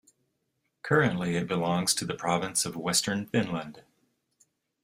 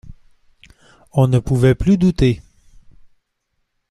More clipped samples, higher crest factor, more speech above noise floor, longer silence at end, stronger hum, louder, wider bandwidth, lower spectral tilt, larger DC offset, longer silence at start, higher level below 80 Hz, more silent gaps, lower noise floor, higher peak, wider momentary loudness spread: neither; first, 22 dB vs 16 dB; second, 50 dB vs 57 dB; second, 1.05 s vs 1.55 s; neither; second, -28 LUFS vs -16 LUFS; first, 16 kHz vs 12 kHz; second, -3.5 dB/octave vs -8 dB/octave; neither; first, 0.85 s vs 0.05 s; second, -64 dBFS vs -34 dBFS; neither; first, -78 dBFS vs -71 dBFS; second, -8 dBFS vs -2 dBFS; about the same, 8 LU vs 7 LU